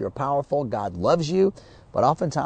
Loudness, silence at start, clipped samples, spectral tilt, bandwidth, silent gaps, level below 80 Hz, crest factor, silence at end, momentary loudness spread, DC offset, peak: -23 LUFS; 0 s; under 0.1%; -7 dB/octave; 9.2 kHz; none; -52 dBFS; 16 dB; 0 s; 5 LU; under 0.1%; -6 dBFS